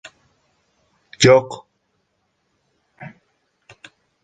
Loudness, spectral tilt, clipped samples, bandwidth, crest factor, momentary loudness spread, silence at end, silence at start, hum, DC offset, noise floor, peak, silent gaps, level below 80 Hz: -14 LUFS; -4.5 dB/octave; under 0.1%; 9.2 kHz; 22 dB; 27 LU; 1.15 s; 1.2 s; none; under 0.1%; -70 dBFS; -2 dBFS; none; -54 dBFS